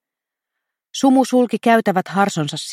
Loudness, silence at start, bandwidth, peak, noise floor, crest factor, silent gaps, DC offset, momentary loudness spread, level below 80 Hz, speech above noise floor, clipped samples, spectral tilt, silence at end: -17 LUFS; 0.95 s; 15 kHz; -2 dBFS; -85 dBFS; 16 dB; none; under 0.1%; 6 LU; -70 dBFS; 69 dB; under 0.1%; -5 dB/octave; 0 s